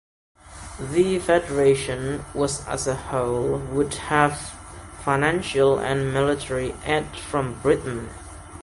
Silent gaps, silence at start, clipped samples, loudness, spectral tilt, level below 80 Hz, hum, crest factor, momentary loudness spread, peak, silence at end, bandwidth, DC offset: none; 0.45 s; under 0.1%; -23 LUFS; -5 dB/octave; -44 dBFS; none; 20 dB; 15 LU; -4 dBFS; 0 s; 11.5 kHz; under 0.1%